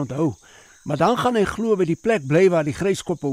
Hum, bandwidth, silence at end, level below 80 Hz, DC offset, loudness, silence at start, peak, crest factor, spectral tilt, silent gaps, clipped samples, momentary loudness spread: none; 15 kHz; 0 s; -50 dBFS; under 0.1%; -20 LUFS; 0 s; -6 dBFS; 14 dB; -6.5 dB/octave; none; under 0.1%; 8 LU